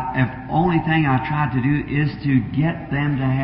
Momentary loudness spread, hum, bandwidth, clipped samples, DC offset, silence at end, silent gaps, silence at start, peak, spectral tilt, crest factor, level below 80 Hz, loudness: 4 LU; none; 5.4 kHz; under 0.1%; under 0.1%; 0 s; none; 0 s; -6 dBFS; -12.5 dB/octave; 14 dB; -40 dBFS; -20 LUFS